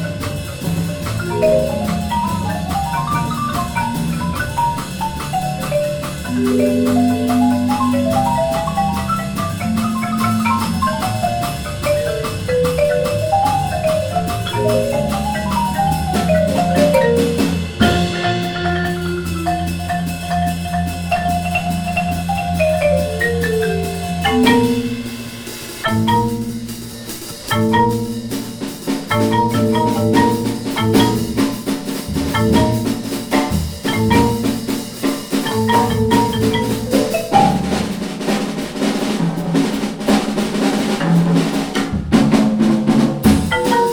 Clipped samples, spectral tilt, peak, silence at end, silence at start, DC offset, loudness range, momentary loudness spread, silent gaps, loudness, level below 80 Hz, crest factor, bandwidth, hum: under 0.1%; -5.5 dB/octave; -2 dBFS; 0 s; 0 s; under 0.1%; 4 LU; 8 LU; none; -17 LUFS; -34 dBFS; 16 dB; over 20 kHz; none